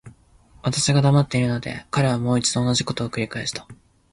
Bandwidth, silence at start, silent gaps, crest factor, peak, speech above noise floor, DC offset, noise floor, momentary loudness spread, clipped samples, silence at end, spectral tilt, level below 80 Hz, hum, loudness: 11.5 kHz; 0.05 s; none; 14 dB; -8 dBFS; 32 dB; under 0.1%; -53 dBFS; 10 LU; under 0.1%; 0.4 s; -5 dB/octave; -50 dBFS; none; -22 LUFS